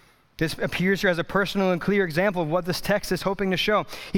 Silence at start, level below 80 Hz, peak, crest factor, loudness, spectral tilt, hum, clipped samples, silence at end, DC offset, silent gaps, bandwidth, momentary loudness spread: 0.4 s; -48 dBFS; -8 dBFS; 16 dB; -24 LUFS; -5.5 dB/octave; none; under 0.1%; 0 s; under 0.1%; none; 18 kHz; 4 LU